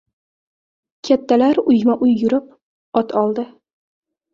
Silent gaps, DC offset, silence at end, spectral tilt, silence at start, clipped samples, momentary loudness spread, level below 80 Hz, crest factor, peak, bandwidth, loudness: 2.62-2.92 s; under 0.1%; 0.9 s; -7 dB/octave; 1.05 s; under 0.1%; 10 LU; -60 dBFS; 16 dB; -2 dBFS; 7.2 kHz; -17 LUFS